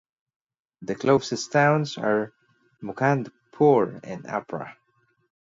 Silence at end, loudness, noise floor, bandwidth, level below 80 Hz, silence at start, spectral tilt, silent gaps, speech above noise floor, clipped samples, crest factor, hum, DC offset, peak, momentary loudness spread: 0.85 s; -23 LUFS; -68 dBFS; 7.8 kHz; -66 dBFS; 0.8 s; -6 dB/octave; none; 45 dB; under 0.1%; 20 dB; none; under 0.1%; -6 dBFS; 18 LU